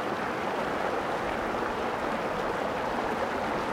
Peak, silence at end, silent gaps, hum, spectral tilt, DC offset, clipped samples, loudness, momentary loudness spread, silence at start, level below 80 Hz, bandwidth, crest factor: -16 dBFS; 0 s; none; none; -5 dB/octave; under 0.1%; under 0.1%; -30 LUFS; 1 LU; 0 s; -52 dBFS; 16.5 kHz; 14 dB